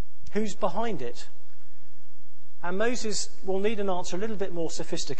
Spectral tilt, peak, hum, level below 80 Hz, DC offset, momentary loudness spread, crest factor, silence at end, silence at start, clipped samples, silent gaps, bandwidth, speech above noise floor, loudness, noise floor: -4 dB/octave; -10 dBFS; none; -54 dBFS; 10%; 9 LU; 20 dB; 0 s; 0.25 s; under 0.1%; none; 8.8 kHz; 29 dB; -31 LUFS; -60 dBFS